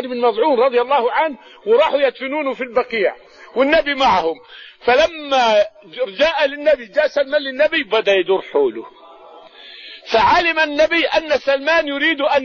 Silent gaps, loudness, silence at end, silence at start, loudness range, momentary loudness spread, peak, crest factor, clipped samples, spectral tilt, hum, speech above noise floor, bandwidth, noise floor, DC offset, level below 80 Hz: none; -16 LUFS; 0 s; 0 s; 2 LU; 9 LU; -4 dBFS; 14 dB; under 0.1%; -3.5 dB/octave; none; 25 dB; 7.2 kHz; -41 dBFS; under 0.1%; -50 dBFS